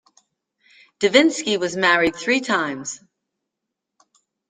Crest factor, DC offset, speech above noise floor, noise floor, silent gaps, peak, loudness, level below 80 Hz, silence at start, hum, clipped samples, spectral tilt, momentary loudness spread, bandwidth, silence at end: 22 dB; under 0.1%; 63 dB; -82 dBFS; none; -2 dBFS; -19 LUFS; -62 dBFS; 1 s; none; under 0.1%; -3 dB/octave; 14 LU; 9.6 kHz; 1.55 s